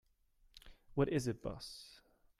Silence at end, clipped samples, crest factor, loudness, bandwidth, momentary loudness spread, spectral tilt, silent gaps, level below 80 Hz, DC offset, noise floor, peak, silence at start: 0.45 s; under 0.1%; 22 dB; -40 LUFS; 14.5 kHz; 25 LU; -6 dB/octave; none; -60 dBFS; under 0.1%; -72 dBFS; -20 dBFS; 0.55 s